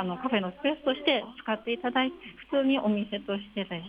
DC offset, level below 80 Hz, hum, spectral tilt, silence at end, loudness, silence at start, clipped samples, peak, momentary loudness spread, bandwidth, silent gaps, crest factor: under 0.1%; -64 dBFS; none; -7.5 dB/octave; 0 s; -29 LUFS; 0 s; under 0.1%; -12 dBFS; 8 LU; 5 kHz; none; 16 dB